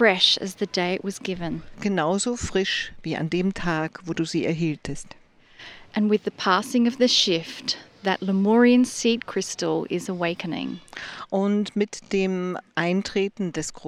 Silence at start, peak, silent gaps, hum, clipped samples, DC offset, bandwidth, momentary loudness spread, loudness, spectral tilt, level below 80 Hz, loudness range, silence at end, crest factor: 0 s; -4 dBFS; none; none; under 0.1%; under 0.1%; 13.5 kHz; 12 LU; -24 LUFS; -4.5 dB/octave; -52 dBFS; 6 LU; 0 s; 20 dB